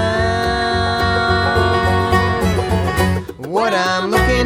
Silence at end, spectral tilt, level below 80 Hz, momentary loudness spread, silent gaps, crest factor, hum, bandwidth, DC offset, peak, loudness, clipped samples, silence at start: 0 s; -5.5 dB/octave; -28 dBFS; 3 LU; none; 14 dB; none; 16 kHz; under 0.1%; -2 dBFS; -16 LUFS; under 0.1%; 0 s